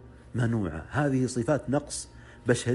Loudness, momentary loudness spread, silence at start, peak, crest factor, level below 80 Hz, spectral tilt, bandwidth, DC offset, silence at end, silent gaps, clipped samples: -29 LUFS; 10 LU; 0 s; -10 dBFS; 20 dB; -50 dBFS; -6 dB/octave; 11.5 kHz; under 0.1%; 0 s; none; under 0.1%